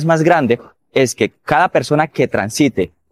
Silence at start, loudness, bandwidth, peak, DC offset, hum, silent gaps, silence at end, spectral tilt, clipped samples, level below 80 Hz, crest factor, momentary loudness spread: 0 s; -16 LUFS; 15.5 kHz; 0 dBFS; under 0.1%; none; none; 0.25 s; -5.5 dB/octave; under 0.1%; -52 dBFS; 14 dB; 8 LU